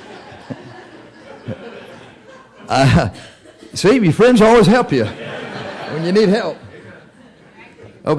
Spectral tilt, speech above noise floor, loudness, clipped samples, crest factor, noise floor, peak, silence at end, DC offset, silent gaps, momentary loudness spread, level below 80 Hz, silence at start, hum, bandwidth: -6.5 dB/octave; 33 dB; -14 LUFS; under 0.1%; 12 dB; -45 dBFS; -6 dBFS; 0 s; under 0.1%; none; 25 LU; -40 dBFS; 0.1 s; none; 11 kHz